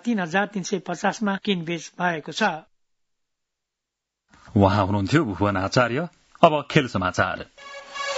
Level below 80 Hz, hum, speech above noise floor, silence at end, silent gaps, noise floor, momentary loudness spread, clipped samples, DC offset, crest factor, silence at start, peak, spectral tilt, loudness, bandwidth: -58 dBFS; none; 62 dB; 0 s; none; -84 dBFS; 12 LU; under 0.1%; under 0.1%; 24 dB; 0.05 s; 0 dBFS; -5.5 dB/octave; -23 LUFS; 8 kHz